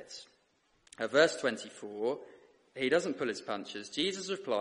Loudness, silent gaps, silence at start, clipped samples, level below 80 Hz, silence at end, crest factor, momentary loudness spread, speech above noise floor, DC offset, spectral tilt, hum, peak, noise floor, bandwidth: -33 LUFS; none; 0 s; under 0.1%; -76 dBFS; 0 s; 24 dB; 16 LU; 39 dB; under 0.1%; -3 dB/octave; none; -12 dBFS; -72 dBFS; 11.5 kHz